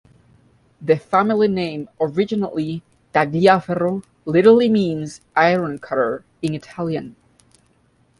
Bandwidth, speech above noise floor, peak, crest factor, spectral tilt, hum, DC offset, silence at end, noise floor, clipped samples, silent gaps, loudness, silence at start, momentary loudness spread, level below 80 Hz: 11.5 kHz; 41 dB; -2 dBFS; 18 dB; -7 dB/octave; none; under 0.1%; 1.1 s; -59 dBFS; under 0.1%; none; -19 LUFS; 0.8 s; 13 LU; -58 dBFS